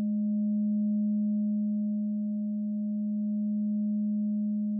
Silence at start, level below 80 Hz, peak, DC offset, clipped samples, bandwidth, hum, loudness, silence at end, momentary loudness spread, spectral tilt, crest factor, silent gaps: 0 s; -86 dBFS; -24 dBFS; under 0.1%; under 0.1%; 0.7 kHz; none; -30 LUFS; 0 s; 4 LU; -20 dB/octave; 6 dB; none